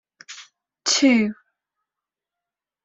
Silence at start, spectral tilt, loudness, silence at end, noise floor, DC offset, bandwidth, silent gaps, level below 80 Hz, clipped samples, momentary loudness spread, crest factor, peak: 0.3 s; -2.5 dB/octave; -19 LUFS; 1.5 s; -88 dBFS; under 0.1%; 8.2 kHz; none; -68 dBFS; under 0.1%; 24 LU; 20 dB; -4 dBFS